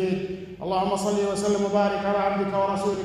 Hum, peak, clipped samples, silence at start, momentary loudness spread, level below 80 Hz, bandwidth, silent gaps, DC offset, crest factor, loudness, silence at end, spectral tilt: none; -10 dBFS; under 0.1%; 0 s; 6 LU; -54 dBFS; 13 kHz; none; under 0.1%; 16 dB; -25 LUFS; 0 s; -5.5 dB/octave